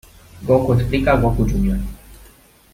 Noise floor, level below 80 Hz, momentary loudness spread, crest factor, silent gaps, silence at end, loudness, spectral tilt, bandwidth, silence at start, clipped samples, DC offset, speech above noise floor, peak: -48 dBFS; -28 dBFS; 12 LU; 16 dB; none; 0.6 s; -18 LUFS; -8 dB/octave; 16 kHz; 0.35 s; under 0.1%; under 0.1%; 32 dB; -4 dBFS